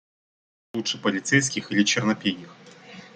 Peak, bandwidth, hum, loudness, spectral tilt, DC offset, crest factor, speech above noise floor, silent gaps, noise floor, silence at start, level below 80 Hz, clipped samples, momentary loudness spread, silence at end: -4 dBFS; 9.4 kHz; none; -23 LUFS; -3.5 dB/octave; under 0.1%; 22 dB; 21 dB; none; -45 dBFS; 0.75 s; -66 dBFS; under 0.1%; 16 LU; 0.1 s